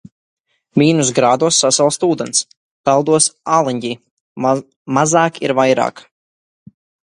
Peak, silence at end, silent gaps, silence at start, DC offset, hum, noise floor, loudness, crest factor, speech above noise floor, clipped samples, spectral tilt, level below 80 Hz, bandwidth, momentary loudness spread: 0 dBFS; 1.15 s; 2.57-2.84 s, 4.11-4.36 s, 4.76-4.85 s; 0.75 s; under 0.1%; none; under -90 dBFS; -15 LUFS; 16 dB; over 75 dB; under 0.1%; -3.5 dB/octave; -60 dBFS; 11.5 kHz; 9 LU